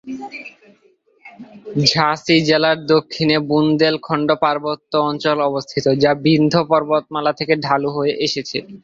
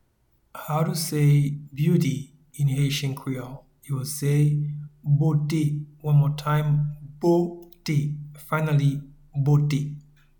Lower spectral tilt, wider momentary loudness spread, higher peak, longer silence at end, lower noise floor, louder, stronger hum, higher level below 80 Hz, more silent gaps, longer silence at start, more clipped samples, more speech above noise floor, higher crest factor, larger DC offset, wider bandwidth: second, -5.5 dB/octave vs -7 dB/octave; second, 10 LU vs 13 LU; first, -2 dBFS vs -10 dBFS; second, 0.05 s vs 0.4 s; second, -45 dBFS vs -66 dBFS; first, -17 LUFS vs -24 LUFS; neither; about the same, -56 dBFS vs -54 dBFS; neither; second, 0.05 s vs 0.55 s; neither; second, 28 dB vs 43 dB; about the same, 16 dB vs 14 dB; neither; second, 7.8 kHz vs 19 kHz